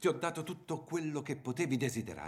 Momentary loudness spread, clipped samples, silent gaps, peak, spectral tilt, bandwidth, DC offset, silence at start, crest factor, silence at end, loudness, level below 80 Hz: 7 LU; under 0.1%; none; -18 dBFS; -5.5 dB/octave; 16 kHz; under 0.1%; 0 s; 18 dB; 0 s; -37 LUFS; -72 dBFS